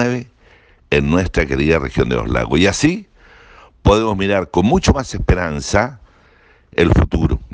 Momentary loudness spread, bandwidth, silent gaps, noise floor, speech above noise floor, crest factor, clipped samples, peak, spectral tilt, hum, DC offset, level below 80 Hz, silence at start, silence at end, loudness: 5 LU; 10 kHz; none; -50 dBFS; 35 dB; 16 dB; under 0.1%; 0 dBFS; -6 dB/octave; none; under 0.1%; -26 dBFS; 0 s; 0 s; -16 LUFS